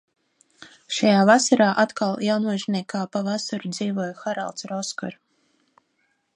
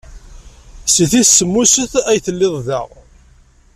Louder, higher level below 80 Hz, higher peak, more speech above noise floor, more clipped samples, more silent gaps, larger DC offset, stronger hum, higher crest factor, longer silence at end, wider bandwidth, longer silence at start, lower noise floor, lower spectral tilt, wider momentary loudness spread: second, -22 LUFS vs -12 LUFS; second, -74 dBFS vs -40 dBFS; about the same, -2 dBFS vs 0 dBFS; first, 48 dB vs 34 dB; neither; neither; neither; neither; first, 22 dB vs 16 dB; first, 1.2 s vs 0.9 s; second, 10.5 kHz vs 16 kHz; first, 0.6 s vs 0.1 s; first, -70 dBFS vs -47 dBFS; first, -4.5 dB/octave vs -3 dB/octave; about the same, 13 LU vs 13 LU